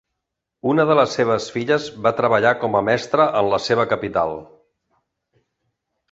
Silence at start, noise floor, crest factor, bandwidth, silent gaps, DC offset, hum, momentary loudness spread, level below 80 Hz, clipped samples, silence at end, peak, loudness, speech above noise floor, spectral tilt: 0.65 s; -80 dBFS; 18 dB; 8 kHz; none; under 0.1%; none; 6 LU; -56 dBFS; under 0.1%; 1.7 s; -2 dBFS; -19 LUFS; 62 dB; -5.5 dB/octave